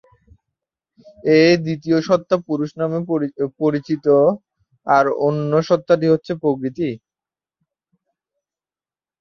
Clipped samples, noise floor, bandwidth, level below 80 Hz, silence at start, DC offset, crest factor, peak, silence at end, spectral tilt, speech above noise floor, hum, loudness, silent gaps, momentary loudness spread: under 0.1%; under -90 dBFS; 6.8 kHz; -60 dBFS; 1.25 s; under 0.1%; 18 dB; -2 dBFS; 2.25 s; -7 dB/octave; over 73 dB; none; -18 LUFS; none; 10 LU